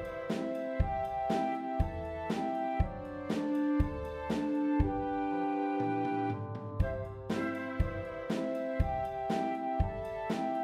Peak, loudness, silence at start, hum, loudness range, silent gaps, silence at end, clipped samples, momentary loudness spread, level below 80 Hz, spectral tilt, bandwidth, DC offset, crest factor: -14 dBFS; -34 LUFS; 0 s; none; 2 LU; none; 0 s; under 0.1%; 5 LU; -42 dBFS; -8 dB/octave; 13 kHz; under 0.1%; 18 dB